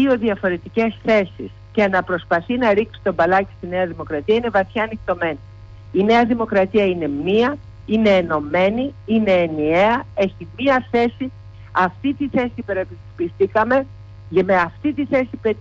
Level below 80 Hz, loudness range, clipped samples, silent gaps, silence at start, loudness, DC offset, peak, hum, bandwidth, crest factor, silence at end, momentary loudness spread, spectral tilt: -46 dBFS; 3 LU; under 0.1%; none; 0 s; -19 LUFS; under 0.1%; -6 dBFS; none; 7.6 kHz; 12 dB; 0 s; 9 LU; -7.5 dB/octave